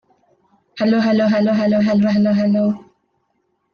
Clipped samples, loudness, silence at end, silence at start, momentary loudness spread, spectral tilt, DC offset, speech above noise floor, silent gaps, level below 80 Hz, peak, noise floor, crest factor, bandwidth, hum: under 0.1%; -16 LUFS; 0.95 s; 0.75 s; 6 LU; -8 dB/octave; under 0.1%; 52 dB; none; -60 dBFS; -6 dBFS; -67 dBFS; 12 dB; 6.6 kHz; none